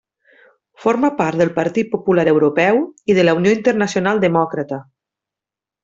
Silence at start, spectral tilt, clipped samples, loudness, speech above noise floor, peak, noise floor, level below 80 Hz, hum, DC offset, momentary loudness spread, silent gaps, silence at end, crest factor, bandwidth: 0.8 s; -6.5 dB/octave; under 0.1%; -16 LUFS; 72 dB; -2 dBFS; -87 dBFS; -58 dBFS; none; under 0.1%; 7 LU; none; 1 s; 14 dB; 7.8 kHz